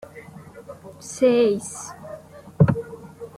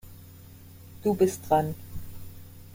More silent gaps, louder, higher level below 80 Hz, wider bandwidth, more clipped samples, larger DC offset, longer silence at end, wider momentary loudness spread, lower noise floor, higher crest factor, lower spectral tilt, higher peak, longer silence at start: neither; first, -21 LUFS vs -26 LUFS; about the same, -52 dBFS vs -50 dBFS; about the same, 15 kHz vs 16.5 kHz; neither; neither; about the same, 0.1 s vs 0 s; about the same, 23 LU vs 24 LU; second, -42 dBFS vs -48 dBFS; about the same, 22 dB vs 20 dB; about the same, -6.5 dB/octave vs -6.5 dB/octave; first, -2 dBFS vs -10 dBFS; about the same, 0.15 s vs 0.05 s